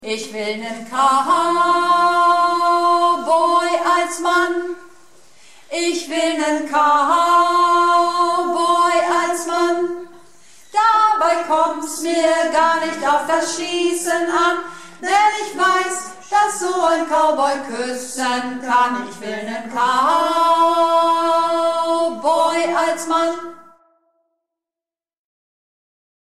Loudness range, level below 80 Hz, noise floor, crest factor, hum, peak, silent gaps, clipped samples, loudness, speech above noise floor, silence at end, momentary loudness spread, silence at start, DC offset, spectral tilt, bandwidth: 4 LU; -64 dBFS; under -90 dBFS; 14 dB; none; -4 dBFS; none; under 0.1%; -17 LUFS; over 73 dB; 2.75 s; 10 LU; 0 s; 0.6%; -2 dB/octave; 14 kHz